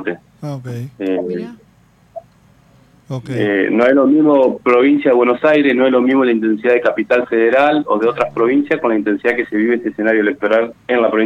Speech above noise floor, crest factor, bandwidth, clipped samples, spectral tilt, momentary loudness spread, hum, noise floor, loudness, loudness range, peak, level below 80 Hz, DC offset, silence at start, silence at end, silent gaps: 37 dB; 14 dB; 7.4 kHz; under 0.1%; -7.5 dB/octave; 14 LU; none; -51 dBFS; -14 LUFS; 9 LU; 0 dBFS; -58 dBFS; under 0.1%; 0 s; 0 s; none